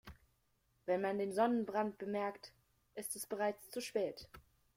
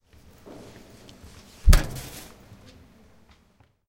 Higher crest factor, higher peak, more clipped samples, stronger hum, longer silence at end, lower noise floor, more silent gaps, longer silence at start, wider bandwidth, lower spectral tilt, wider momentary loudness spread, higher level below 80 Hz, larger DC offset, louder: second, 20 dB vs 26 dB; second, -20 dBFS vs -2 dBFS; neither; neither; second, 0.35 s vs 1.85 s; first, -78 dBFS vs -61 dBFS; neither; second, 0.05 s vs 1.65 s; about the same, 16.5 kHz vs 16.5 kHz; about the same, -4.5 dB/octave vs -4.5 dB/octave; second, 20 LU vs 28 LU; second, -72 dBFS vs -28 dBFS; neither; second, -39 LUFS vs -25 LUFS